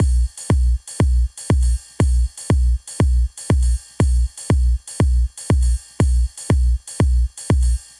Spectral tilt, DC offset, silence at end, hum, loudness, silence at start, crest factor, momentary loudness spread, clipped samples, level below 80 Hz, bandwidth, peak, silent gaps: -6.5 dB/octave; under 0.1%; 0.2 s; 60 Hz at -25 dBFS; -20 LUFS; 0 s; 12 dB; 3 LU; under 0.1%; -18 dBFS; 11.5 kHz; -6 dBFS; none